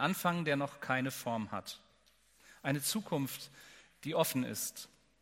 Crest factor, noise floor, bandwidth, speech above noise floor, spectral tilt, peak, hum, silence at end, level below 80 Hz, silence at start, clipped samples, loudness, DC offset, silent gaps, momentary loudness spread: 22 dB; -69 dBFS; 16.5 kHz; 33 dB; -4 dB/octave; -16 dBFS; none; 0.35 s; -76 dBFS; 0 s; under 0.1%; -36 LUFS; under 0.1%; none; 18 LU